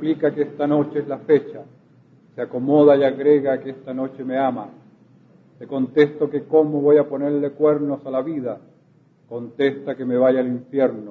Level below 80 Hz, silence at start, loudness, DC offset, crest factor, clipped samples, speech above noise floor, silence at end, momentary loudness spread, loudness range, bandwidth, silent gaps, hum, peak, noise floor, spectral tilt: -70 dBFS; 0 s; -20 LUFS; under 0.1%; 18 dB; under 0.1%; 36 dB; 0 s; 15 LU; 3 LU; 4.3 kHz; none; none; -2 dBFS; -55 dBFS; -9.5 dB/octave